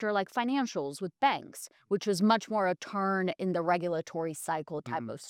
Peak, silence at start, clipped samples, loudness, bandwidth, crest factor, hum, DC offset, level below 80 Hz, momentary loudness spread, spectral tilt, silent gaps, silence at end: -12 dBFS; 0 s; under 0.1%; -31 LUFS; 16.5 kHz; 18 dB; none; under 0.1%; -82 dBFS; 9 LU; -5 dB/octave; none; 0 s